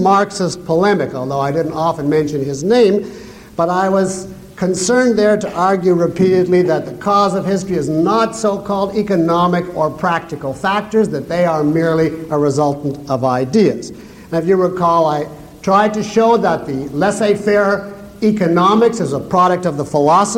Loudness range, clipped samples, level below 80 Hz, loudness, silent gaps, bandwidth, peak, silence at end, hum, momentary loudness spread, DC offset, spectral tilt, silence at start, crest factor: 2 LU; under 0.1%; -48 dBFS; -15 LUFS; none; 16 kHz; -2 dBFS; 0 s; none; 8 LU; under 0.1%; -6 dB/octave; 0 s; 12 dB